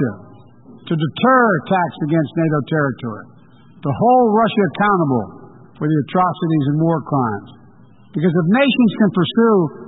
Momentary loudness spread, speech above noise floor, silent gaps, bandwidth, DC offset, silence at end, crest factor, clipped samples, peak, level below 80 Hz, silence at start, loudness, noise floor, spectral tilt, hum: 11 LU; 31 dB; none; 4 kHz; 0.2%; 0 s; 14 dB; under 0.1%; -4 dBFS; -56 dBFS; 0 s; -16 LUFS; -46 dBFS; -12.5 dB/octave; none